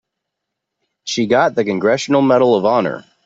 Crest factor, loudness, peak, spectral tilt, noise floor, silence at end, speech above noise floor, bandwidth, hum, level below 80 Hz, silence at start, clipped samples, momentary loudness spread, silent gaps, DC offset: 14 dB; -15 LUFS; -2 dBFS; -5 dB/octave; -79 dBFS; 0.25 s; 64 dB; 8 kHz; none; -60 dBFS; 1.05 s; under 0.1%; 11 LU; none; under 0.1%